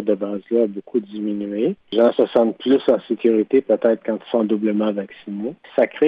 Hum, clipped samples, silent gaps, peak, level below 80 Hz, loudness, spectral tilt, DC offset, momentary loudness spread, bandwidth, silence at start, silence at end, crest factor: none; under 0.1%; none; -4 dBFS; -66 dBFS; -20 LUFS; -9 dB/octave; under 0.1%; 9 LU; 5.2 kHz; 0 s; 0 s; 14 dB